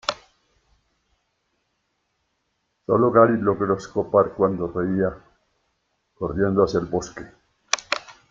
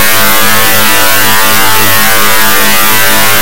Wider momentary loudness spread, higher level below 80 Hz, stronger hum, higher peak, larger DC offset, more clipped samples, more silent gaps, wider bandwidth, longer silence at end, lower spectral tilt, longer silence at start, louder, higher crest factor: first, 13 LU vs 0 LU; second, -52 dBFS vs -34 dBFS; neither; about the same, 0 dBFS vs 0 dBFS; second, under 0.1% vs 40%; second, under 0.1% vs 9%; neither; second, 7.8 kHz vs over 20 kHz; first, 0.2 s vs 0 s; first, -5.5 dB/octave vs -1 dB/octave; about the same, 0.1 s vs 0 s; second, -22 LUFS vs -5 LUFS; first, 24 dB vs 10 dB